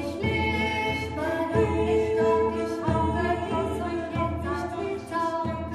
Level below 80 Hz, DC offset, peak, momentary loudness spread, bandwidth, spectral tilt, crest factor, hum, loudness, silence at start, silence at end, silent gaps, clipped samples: -42 dBFS; under 0.1%; -12 dBFS; 7 LU; 13 kHz; -6.5 dB/octave; 14 dB; none; -26 LUFS; 0 s; 0 s; none; under 0.1%